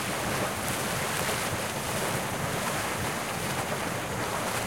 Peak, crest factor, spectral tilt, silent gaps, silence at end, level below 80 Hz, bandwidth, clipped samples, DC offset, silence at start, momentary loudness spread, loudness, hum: -10 dBFS; 20 dB; -3 dB/octave; none; 0 s; -52 dBFS; 16.5 kHz; under 0.1%; 0.1%; 0 s; 2 LU; -29 LUFS; none